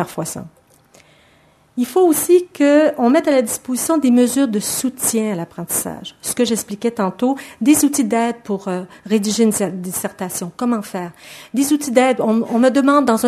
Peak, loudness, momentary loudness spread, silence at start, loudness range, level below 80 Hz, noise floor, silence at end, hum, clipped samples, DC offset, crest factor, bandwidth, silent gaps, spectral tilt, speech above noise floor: 0 dBFS; -17 LUFS; 12 LU; 0 s; 5 LU; -60 dBFS; -53 dBFS; 0 s; none; under 0.1%; under 0.1%; 18 dB; 14 kHz; none; -4 dB/octave; 36 dB